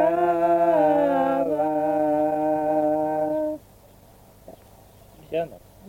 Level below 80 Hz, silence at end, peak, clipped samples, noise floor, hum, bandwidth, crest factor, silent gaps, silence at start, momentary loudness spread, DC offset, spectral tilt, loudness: -58 dBFS; 0 s; -8 dBFS; under 0.1%; -51 dBFS; none; 17 kHz; 14 dB; none; 0 s; 11 LU; under 0.1%; -7.5 dB/octave; -22 LUFS